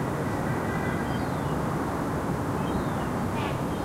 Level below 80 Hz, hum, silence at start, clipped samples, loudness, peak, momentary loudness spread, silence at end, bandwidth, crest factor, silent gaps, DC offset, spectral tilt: -42 dBFS; none; 0 s; under 0.1%; -29 LUFS; -16 dBFS; 1 LU; 0 s; 16 kHz; 12 dB; none; under 0.1%; -6.5 dB/octave